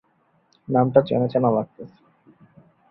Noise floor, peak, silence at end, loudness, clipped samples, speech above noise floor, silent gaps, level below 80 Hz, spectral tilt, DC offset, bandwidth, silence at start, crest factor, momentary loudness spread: -64 dBFS; -2 dBFS; 1.05 s; -20 LUFS; under 0.1%; 44 dB; none; -62 dBFS; -11 dB/octave; under 0.1%; 5.6 kHz; 0.7 s; 22 dB; 22 LU